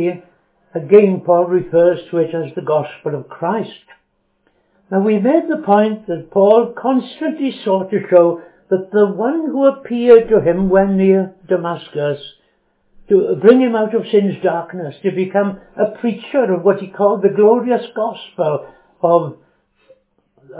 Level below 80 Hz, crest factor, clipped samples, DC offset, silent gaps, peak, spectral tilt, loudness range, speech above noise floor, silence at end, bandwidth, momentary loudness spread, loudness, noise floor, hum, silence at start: -54 dBFS; 16 dB; 0.1%; under 0.1%; none; 0 dBFS; -11.5 dB/octave; 4 LU; 49 dB; 0 s; 4 kHz; 12 LU; -15 LUFS; -63 dBFS; none; 0 s